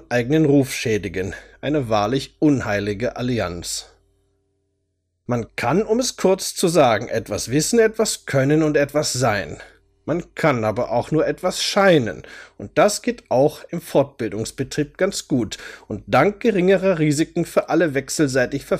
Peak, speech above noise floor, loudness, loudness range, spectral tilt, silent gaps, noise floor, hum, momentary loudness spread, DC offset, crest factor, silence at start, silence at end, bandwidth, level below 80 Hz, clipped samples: -4 dBFS; 52 dB; -20 LUFS; 5 LU; -5 dB/octave; none; -72 dBFS; none; 11 LU; under 0.1%; 16 dB; 0.1 s; 0 s; 15.5 kHz; -48 dBFS; under 0.1%